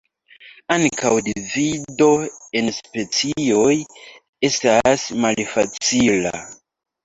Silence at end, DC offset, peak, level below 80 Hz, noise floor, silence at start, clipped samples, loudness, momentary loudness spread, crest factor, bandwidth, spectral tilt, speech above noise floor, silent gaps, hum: 0.5 s; under 0.1%; -2 dBFS; -54 dBFS; -58 dBFS; 0.4 s; under 0.1%; -19 LUFS; 9 LU; 18 dB; 8.2 kHz; -3.5 dB/octave; 39 dB; 4.29-4.33 s; none